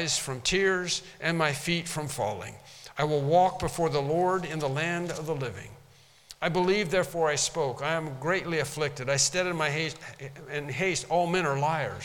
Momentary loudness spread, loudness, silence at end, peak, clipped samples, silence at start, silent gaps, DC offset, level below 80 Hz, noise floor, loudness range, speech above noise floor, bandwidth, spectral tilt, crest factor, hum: 11 LU; -28 LUFS; 0 s; -10 dBFS; under 0.1%; 0 s; none; under 0.1%; -54 dBFS; -57 dBFS; 2 LU; 29 dB; 18 kHz; -3.5 dB/octave; 20 dB; none